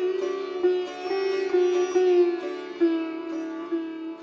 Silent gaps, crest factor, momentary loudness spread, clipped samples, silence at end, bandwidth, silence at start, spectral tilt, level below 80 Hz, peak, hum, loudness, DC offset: none; 14 dB; 11 LU; under 0.1%; 0 s; 7 kHz; 0 s; -3.5 dB/octave; -74 dBFS; -12 dBFS; none; -26 LUFS; under 0.1%